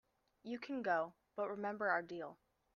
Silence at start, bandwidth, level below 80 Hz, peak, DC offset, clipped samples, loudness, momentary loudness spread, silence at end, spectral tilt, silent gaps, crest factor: 0.45 s; 7 kHz; -84 dBFS; -22 dBFS; under 0.1%; under 0.1%; -41 LUFS; 11 LU; 0.4 s; -6.5 dB/octave; none; 20 dB